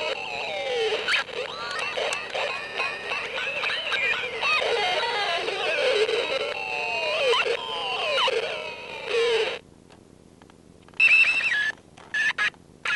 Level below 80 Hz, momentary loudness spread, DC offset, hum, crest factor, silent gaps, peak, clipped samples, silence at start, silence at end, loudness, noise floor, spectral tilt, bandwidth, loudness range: -64 dBFS; 9 LU; under 0.1%; none; 16 dB; none; -10 dBFS; under 0.1%; 0 s; 0 s; -24 LUFS; -51 dBFS; -1 dB/octave; 11.5 kHz; 4 LU